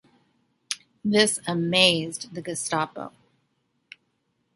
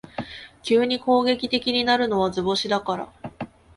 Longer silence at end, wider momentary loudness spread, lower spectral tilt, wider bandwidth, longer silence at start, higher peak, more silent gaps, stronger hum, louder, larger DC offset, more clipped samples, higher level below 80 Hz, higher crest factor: first, 1.45 s vs 0.3 s; about the same, 15 LU vs 16 LU; second, -3 dB/octave vs -4.5 dB/octave; about the same, 12 kHz vs 11.5 kHz; first, 0.7 s vs 0.2 s; about the same, -4 dBFS vs -6 dBFS; neither; neither; about the same, -24 LUFS vs -22 LUFS; neither; neither; second, -68 dBFS vs -56 dBFS; first, 24 dB vs 18 dB